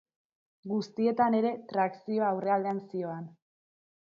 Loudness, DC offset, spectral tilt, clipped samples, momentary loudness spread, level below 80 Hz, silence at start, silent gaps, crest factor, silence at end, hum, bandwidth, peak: -30 LUFS; under 0.1%; -7.5 dB/octave; under 0.1%; 13 LU; -80 dBFS; 0.65 s; none; 18 dB; 0.85 s; none; 7 kHz; -14 dBFS